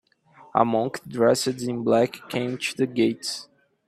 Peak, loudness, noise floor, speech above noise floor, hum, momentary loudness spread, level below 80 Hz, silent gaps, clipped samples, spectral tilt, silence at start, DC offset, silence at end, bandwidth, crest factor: -4 dBFS; -24 LUFS; -53 dBFS; 30 dB; none; 9 LU; -66 dBFS; none; under 0.1%; -5 dB/octave; 0.4 s; under 0.1%; 0.45 s; 15 kHz; 20 dB